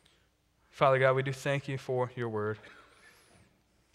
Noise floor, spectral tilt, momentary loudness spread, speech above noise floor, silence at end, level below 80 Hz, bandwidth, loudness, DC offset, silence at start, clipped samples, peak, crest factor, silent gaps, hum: -70 dBFS; -6 dB/octave; 10 LU; 40 dB; 1.2 s; -70 dBFS; 13.5 kHz; -30 LUFS; under 0.1%; 0.75 s; under 0.1%; -10 dBFS; 22 dB; none; none